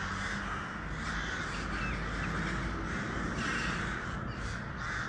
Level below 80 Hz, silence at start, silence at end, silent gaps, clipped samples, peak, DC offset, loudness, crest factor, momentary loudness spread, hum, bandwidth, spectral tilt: -44 dBFS; 0 s; 0 s; none; under 0.1%; -22 dBFS; under 0.1%; -36 LUFS; 14 dB; 5 LU; none; 11 kHz; -4.5 dB/octave